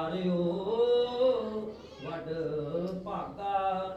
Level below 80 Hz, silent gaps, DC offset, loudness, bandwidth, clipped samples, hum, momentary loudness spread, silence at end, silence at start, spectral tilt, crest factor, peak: -60 dBFS; none; under 0.1%; -31 LUFS; 7.8 kHz; under 0.1%; none; 12 LU; 0 s; 0 s; -8 dB/octave; 14 dB; -18 dBFS